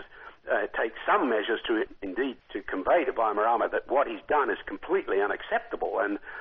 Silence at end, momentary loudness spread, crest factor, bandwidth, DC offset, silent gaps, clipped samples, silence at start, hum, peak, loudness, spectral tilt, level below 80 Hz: 0 s; 8 LU; 16 dB; 4.7 kHz; under 0.1%; none; under 0.1%; 0 s; none; -12 dBFS; -28 LUFS; -1 dB/octave; -58 dBFS